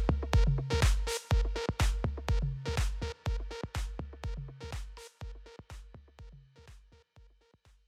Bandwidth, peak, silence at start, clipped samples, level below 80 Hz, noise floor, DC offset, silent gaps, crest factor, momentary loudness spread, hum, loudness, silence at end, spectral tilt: 14.5 kHz; -14 dBFS; 0 s; under 0.1%; -36 dBFS; -64 dBFS; under 0.1%; none; 18 dB; 22 LU; none; -34 LUFS; 0.7 s; -5 dB/octave